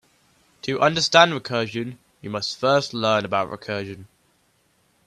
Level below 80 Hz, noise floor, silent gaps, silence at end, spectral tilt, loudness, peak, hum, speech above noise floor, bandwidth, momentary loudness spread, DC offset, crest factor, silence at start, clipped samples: -64 dBFS; -64 dBFS; none; 1 s; -4 dB/octave; -21 LUFS; 0 dBFS; none; 42 dB; 12.5 kHz; 18 LU; under 0.1%; 24 dB; 0.65 s; under 0.1%